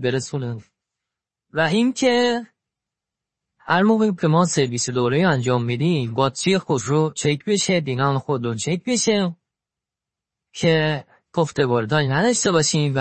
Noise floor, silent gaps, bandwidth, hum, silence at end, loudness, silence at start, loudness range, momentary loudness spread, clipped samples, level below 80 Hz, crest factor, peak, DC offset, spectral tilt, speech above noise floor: -87 dBFS; none; 8.8 kHz; none; 0 s; -20 LUFS; 0 s; 4 LU; 7 LU; under 0.1%; -60 dBFS; 18 dB; -2 dBFS; under 0.1%; -5 dB/octave; 68 dB